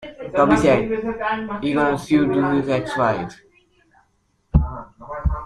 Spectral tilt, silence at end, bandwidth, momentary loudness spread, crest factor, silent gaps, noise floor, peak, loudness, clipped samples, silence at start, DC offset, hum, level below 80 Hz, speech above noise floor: -7 dB/octave; 0 s; 11.5 kHz; 11 LU; 18 dB; none; -65 dBFS; -2 dBFS; -20 LUFS; under 0.1%; 0 s; under 0.1%; none; -32 dBFS; 46 dB